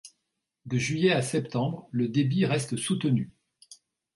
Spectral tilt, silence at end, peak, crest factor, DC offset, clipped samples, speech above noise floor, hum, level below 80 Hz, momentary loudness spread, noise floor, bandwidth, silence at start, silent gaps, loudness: -5.5 dB/octave; 0.4 s; -10 dBFS; 18 dB; under 0.1%; under 0.1%; 55 dB; none; -64 dBFS; 6 LU; -82 dBFS; 11.5 kHz; 0.05 s; none; -27 LUFS